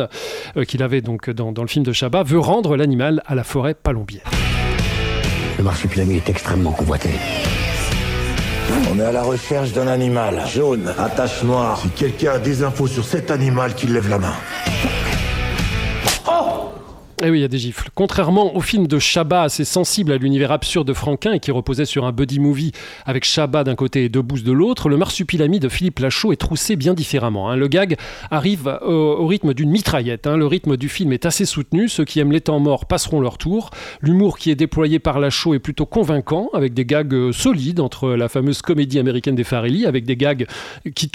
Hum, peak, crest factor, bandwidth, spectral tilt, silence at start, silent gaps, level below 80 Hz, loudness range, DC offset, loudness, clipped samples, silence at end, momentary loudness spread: none; -2 dBFS; 16 dB; 16.5 kHz; -5.5 dB/octave; 0 s; none; -32 dBFS; 2 LU; under 0.1%; -18 LUFS; under 0.1%; 0.05 s; 5 LU